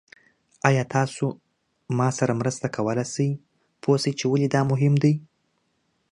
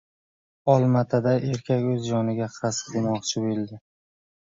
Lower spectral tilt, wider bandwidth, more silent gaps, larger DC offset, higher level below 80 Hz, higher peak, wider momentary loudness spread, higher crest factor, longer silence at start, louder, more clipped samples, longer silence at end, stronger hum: about the same, -6 dB/octave vs -6 dB/octave; first, 11 kHz vs 7.8 kHz; neither; neither; about the same, -64 dBFS vs -62 dBFS; first, -2 dBFS vs -6 dBFS; about the same, 9 LU vs 8 LU; about the same, 22 dB vs 20 dB; about the same, 0.65 s vs 0.65 s; about the same, -24 LUFS vs -24 LUFS; neither; about the same, 0.85 s vs 0.8 s; neither